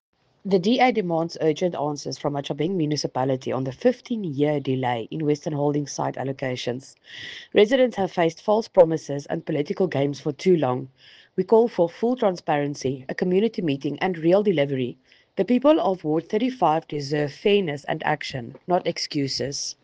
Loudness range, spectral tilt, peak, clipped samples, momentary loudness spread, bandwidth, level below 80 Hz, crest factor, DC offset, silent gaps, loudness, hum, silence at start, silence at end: 3 LU; -6 dB/octave; -4 dBFS; under 0.1%; 10 LU; 9.2 kHz; -64 dBFS; 20 dB; under 0.1%; none; -23 LUFS; none; 0.45 s; 0.1 s